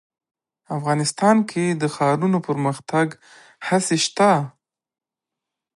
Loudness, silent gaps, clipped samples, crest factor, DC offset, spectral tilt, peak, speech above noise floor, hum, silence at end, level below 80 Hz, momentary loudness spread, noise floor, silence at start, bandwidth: -20 LUFS; none; under 0.1%; 18 dB; under 0.1%; -5 dB/octave; -4 dBFS; 66 dB; none; 1.25 s; -70 dBFS; 9 LU; -86 dBFS; 0.7 s; 11.5 kHz